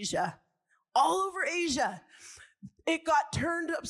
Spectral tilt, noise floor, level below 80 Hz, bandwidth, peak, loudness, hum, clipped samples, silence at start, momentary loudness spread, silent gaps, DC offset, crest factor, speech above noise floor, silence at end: -3.5 dB/octave; -75 dBFS; -64 dBFS; 14.5 kHz; -14 dBFS; -30 LUFS; none; under 0.1%; 0 s; 22 LU; none; under 0.1%; 18 dB; 44 dB; 0 s